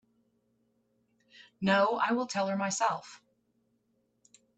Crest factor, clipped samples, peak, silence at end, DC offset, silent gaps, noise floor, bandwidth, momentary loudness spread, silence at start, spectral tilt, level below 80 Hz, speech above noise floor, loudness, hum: 20 dB; under 0.1%; -14 dBFS; 1.4 s; under 0.1%; none; -75 dBFS; 9 kHz; 7 LU; 1.6 s; -4 dB/octave; -76 dBFS; 46 dB; -30 LUFS; none